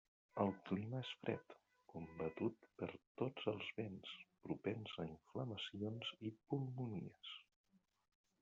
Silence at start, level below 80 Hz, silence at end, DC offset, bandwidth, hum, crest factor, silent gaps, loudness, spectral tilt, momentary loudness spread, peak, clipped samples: 0.35 s; -80 dBFS; 1 s; under 0.1%; 7.4 kHz; none; 24 dB; 3.07-3.15 s; -47 LUFS; -5 dB/octave; 11 LU; -24 dBFS; under 0.1%